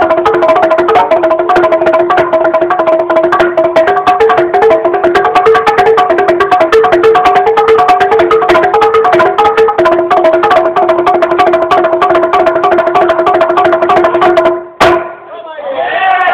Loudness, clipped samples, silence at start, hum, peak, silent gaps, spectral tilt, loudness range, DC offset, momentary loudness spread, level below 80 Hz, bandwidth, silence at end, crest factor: -8 LUFS; 2%; 0 s; none; 0 dBFS; none; -5.5 dB/octave; 2 LU; under 0.1%; 3 LU; -42 dBFS; 11.5 kHz; 0 s; 8 dB